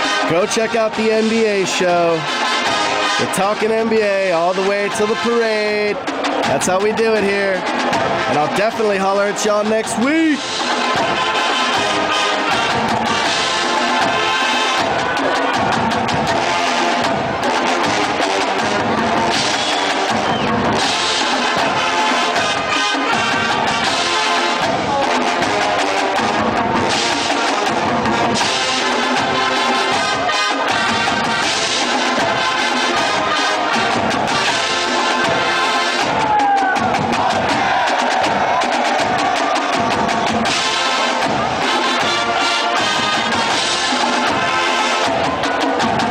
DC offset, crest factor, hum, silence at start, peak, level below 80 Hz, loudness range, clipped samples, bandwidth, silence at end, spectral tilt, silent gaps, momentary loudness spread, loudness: under 0.1%; 12 dB; none; 0 s; -6 dBFS; -48 dBFS; 1 LU; under 0.1%; 16 kHz; 0 s; -3 dB/octave; none; 2 LU; -16 LUFS